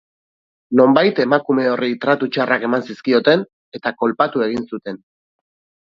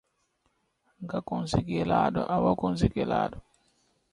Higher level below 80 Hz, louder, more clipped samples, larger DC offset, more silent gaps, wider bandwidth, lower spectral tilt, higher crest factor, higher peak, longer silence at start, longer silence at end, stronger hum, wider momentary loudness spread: second, -62 dBFS vs -48 dBFS; first, -17 LUFS vs -28 LUFS; neither; neither; first, 3.53-3.72 s vs none; second, 7 kHz vs 11 kHz; about the same, -7 dB/octave vs -7 dB/octave; about the same, 18 dB vs 20 dB; first, 0 dBFS vs -8 dBFS; second, 0.7 s vs 1 s; first, 0.95 s vs 0.7 s; neither; first, 13 LU vs 9 LU